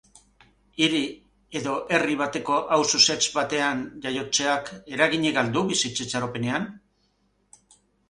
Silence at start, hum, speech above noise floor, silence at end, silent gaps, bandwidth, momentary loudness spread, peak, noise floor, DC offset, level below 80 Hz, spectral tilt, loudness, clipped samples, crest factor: 0.8 s; 50 Hz at -60 dBFS; 44 dB; 1.3 s; none; 11.5 kHz; 12 LU; -4 dBFS; -68 dBFS; under 0.1%; -62 dBFS; -2.5 dB/octave; -24 LUFS; under 0.1%; 22 dB